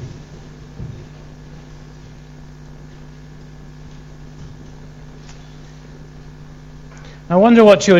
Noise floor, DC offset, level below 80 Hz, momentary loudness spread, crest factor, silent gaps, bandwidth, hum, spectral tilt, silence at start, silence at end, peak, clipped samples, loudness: -38 dBFS; under 0.1%; -42 dBFS; 26 LU; 20 dB; none; 9 kHz; none; -6 dB/octave; 0 s; 0 s; 0 dBFS; under 0.1%; -11 LUFS